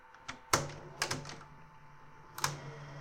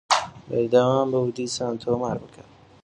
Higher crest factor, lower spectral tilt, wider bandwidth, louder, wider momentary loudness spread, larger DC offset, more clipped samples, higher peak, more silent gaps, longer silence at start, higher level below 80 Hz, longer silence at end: first, 30 dB vs 20 dB; second, -2.5 dB/octave vs -4.5 dB/octave; first, 16.5 kHz vs 11 kHz; second, -37 LUFS vs -24 LUFS; first, 24 LU vs 10 LU; neither; neither; second, -10 dBFS vs -4 dBFS; neither; about the same, 0 s vs 0.1 s; second, -64 dBFS vs -58 dBFS; second, 0 s vs 0.55 s